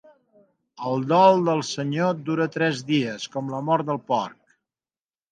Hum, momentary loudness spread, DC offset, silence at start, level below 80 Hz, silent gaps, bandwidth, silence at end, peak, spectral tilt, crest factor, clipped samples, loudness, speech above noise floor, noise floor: none; 12 LU; under 0.1%; 0.8 s; -72 dBFS; none; 9.4 kHz; 1 s; -2 dBFS; -6 dB/octave; 22 dB; under 0.1%; -23 LUFS; over 68 dB; under -90 dBFS